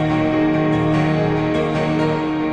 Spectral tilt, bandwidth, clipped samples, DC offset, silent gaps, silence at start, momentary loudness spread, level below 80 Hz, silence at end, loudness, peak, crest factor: -8 dB/octave; 8.8 kHz; under 0.1%; under 0.1%; none; 0 s; 2 LU; -40 dBFS; 0 s; -18 LUFS; -6 dBFS; 12 dB